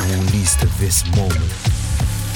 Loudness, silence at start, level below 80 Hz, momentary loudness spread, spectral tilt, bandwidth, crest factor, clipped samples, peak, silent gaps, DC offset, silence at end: -17 LUFS; 0 s; -24 dBFS; 5 LU; -4 dB/octave; 20 kHz; 14 dB; under 0.1%; -2 dBFS; none; under 0.1%; 0 s